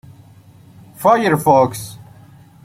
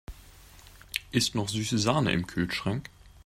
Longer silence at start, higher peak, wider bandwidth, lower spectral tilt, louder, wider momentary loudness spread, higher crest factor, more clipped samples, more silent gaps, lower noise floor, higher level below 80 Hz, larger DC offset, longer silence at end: first, 1 s vs 0.1 s; first, -2 dBFS vs -8 dBFS; about the same, 16.5 kHz vs 16 kHz; first, -6 dB/octave vs -4.5 dB/octave; first, -15 LUFS vs -29 LUFS; first, 16 LU vs 11 LU; second, 16 dB vs 22 dB; neither; neither; second, -44 dBFS vs -52 dBFS; about the same, -54 dBFS vs -52 dBFS; neither; first, 0.6 s vs 0.15 s